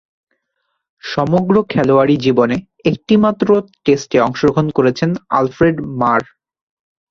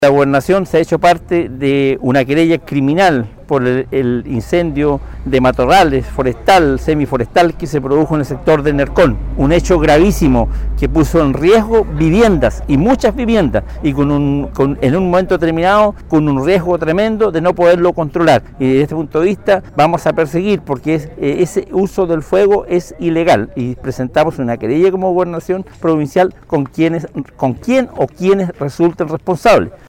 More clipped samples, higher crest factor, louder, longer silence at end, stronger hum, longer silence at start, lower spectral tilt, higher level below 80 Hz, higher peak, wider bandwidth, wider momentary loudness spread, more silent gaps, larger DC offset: neither; about the same, 14 dB vs 10 dB; about the same, -15 LUFS vs -13 LUFS; first, 0.9 s vs 0.15 s; neither; first, 1.05 s vs 0 s; about the same, -7 dB/octave vs -6.5 dB/octave; second, -48 dBFS vs -28 dBFS; about the same, -2 dBFS vs -2 dBFS; second, 7.4 kHz vs 17 kHz; about the same, 6 LU vs 7 LU; neither; neither